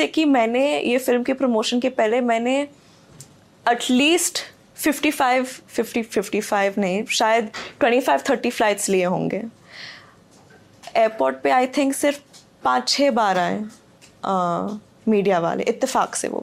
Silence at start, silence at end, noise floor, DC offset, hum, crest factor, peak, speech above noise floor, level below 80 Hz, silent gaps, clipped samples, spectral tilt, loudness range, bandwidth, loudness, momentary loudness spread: 0 s; 0 s; -50 dBFS; under 0.1%; none; 14 dB; -8 dBFS; 30 dB; -64 dBFS; none; under 0.1%; -3.5 dB/octave; 3 LU; 16 kHz; -20 LUFS; 11 LU